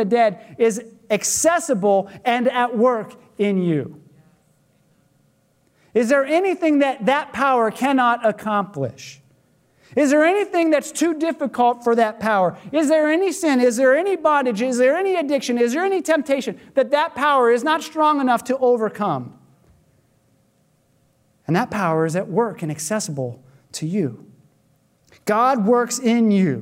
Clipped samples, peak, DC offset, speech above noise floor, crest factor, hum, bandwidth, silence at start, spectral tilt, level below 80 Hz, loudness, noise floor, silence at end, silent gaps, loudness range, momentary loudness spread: under 0.1%; -6 dBFS; under 0.1%; 43 dB; 14 dB; none; 16 kHz; 0 s; -5 dB/octave; -68 dBFS; -19 LUFS; -62 dBFS; 0 s; none; 7 LU; 9 LU